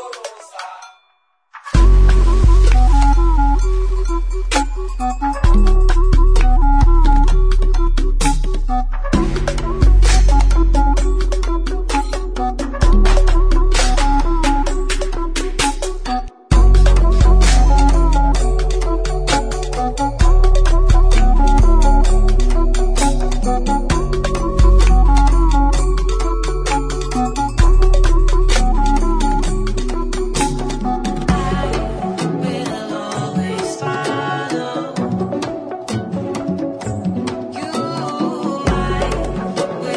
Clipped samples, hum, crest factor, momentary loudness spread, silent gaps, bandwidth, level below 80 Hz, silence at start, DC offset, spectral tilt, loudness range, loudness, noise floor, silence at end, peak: under 0.1%; none; 12 dB; 9 LU; none; 10.5 kHz; -14 dBFS; 0 s; under 0.1%; -5.5 dB/octave; 6 LU; -17 LUFS; -61 dBFS; 0 s; -2 dBFS